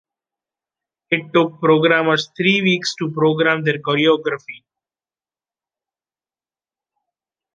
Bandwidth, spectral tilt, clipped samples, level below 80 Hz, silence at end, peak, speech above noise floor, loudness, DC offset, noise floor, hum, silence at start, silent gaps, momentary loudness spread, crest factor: 9.2 kHz; -5.5 dB/octave; under 0.1%; -68 dBFS; 3 s; -2 dBFS; over 73 dB; -17 LUFS; under 0.1%; under -90 dBFS; none; 1.1 s; none; 8 LU; 18 dB